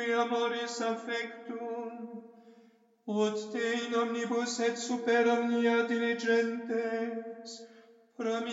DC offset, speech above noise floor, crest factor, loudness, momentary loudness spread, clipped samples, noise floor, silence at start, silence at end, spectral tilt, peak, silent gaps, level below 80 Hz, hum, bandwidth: under 0.1%; 31 dB; 16 dB; -31 LUFS; 15 LU; under 0.1%; -62 dBFS; 0 s; 0 s; -3.5 dB/octave; -16 dBFS; none; under -90 dBFS; none; 8 kHz